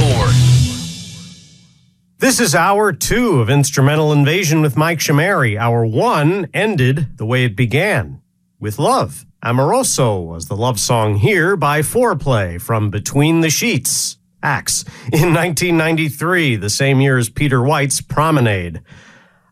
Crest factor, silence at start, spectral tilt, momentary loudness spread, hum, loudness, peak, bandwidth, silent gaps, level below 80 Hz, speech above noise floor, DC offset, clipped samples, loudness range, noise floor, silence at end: 14 dB; 0 s; -5 dB/octave; 7 LU; none; -15 LUFS; 0 dBFS; 15.5 kHz; none; -38 dBFS; 39 dB; under 0.1%; under 0.1%; 3 LU; -53 dBFS; 0.7 s